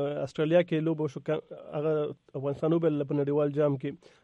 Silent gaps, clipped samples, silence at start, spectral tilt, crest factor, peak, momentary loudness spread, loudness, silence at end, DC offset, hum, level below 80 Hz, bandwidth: none; under 0.1%; 0 s; -8.5 dB/octave; 16 dB; -12 dBFS; 9 LU; -29 LUFS; 0.3 s; under 0.1%; none; -70 dBFS; 8.4 kHz